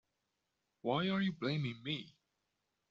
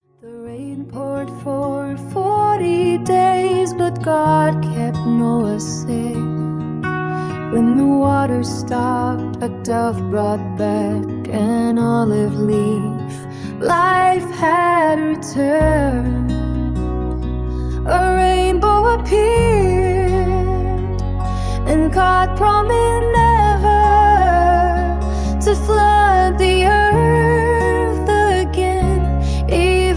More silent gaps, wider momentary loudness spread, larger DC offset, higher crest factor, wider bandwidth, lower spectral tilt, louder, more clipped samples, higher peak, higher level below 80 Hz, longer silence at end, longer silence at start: neither; about the same, 8 LU vs 10 LU; neither; about the same, 18 dB vs 14 dB; second, 7.2 kHz vs 10.5 kHz; second, -4.5 dB/octave vs -6.5 dB/octave; second, -38 LUFS vs -16 LUFS; neither; second, -22 dBFS vs -2 dBFS; second, -76 dBFS vs -24 dBFS; first, 0.8 s vs 0 s; first, 0.85 s vs 0.25 s